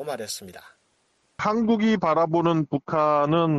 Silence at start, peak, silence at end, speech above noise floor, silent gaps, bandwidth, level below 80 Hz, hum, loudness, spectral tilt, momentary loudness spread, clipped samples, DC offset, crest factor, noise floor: 0 s; -10 dBFS; 0 s; 45 dB; none; 13 kHz; -60 dBFS; none; -23 LUFS; -6.5 dB/octave; 10 LU; under 0.1%; under 0.1%; 14 dB; -67 dBFS